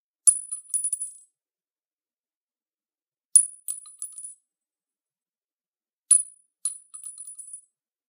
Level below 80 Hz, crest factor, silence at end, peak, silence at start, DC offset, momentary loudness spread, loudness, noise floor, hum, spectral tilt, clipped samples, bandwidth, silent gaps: under -90 dBFS; 28 dB; 0.5 s; 0 dBFS; 0.25 s; under 0.1%; 22 LU; -22 LUFS; under -90 dBFS; none; 6.5 dB/octave; under 0.1%; 15.5 kHz; 1.93-1.97 s, 2.35-2.48 s, 3.25-3.29 s, 5.37-5.57 s, 5.68-5.73 s, 5.93-6.03 s